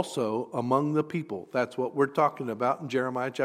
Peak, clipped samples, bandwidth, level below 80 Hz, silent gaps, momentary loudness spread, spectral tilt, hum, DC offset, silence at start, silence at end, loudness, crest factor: -10 dBFS; under 0.1%; 15 kHz; -78 dBFS; none; 6 LU; -6.5 dB/octave; none; under 0.1%; 0 s; 0 s; -28 LUFS; 18 dB